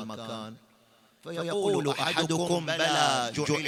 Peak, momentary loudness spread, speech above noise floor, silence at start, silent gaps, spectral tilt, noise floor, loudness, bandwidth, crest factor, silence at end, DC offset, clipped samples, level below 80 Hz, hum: -8 dBFS; 15 LU; 34 dB; 0 s; none; -3.5 dB/octave; -62 dBFS; -27 LUFS; 16 kHz; 20 dB; 0 s; under 0.1%; under 0.1%; -68 dBFS; none